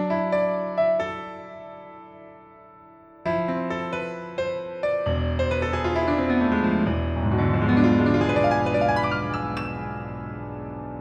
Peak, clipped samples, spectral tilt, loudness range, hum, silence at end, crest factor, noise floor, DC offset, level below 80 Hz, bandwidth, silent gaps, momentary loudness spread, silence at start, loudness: -6 dBFS; under 0.1%; -8 dB/octave; 9 LU; none; 0 s; 18 dB; -49 dBFS; under 0.1%; -40 dBFS; 9 kHz; none; 14 LU; 0 s; -24 LUFS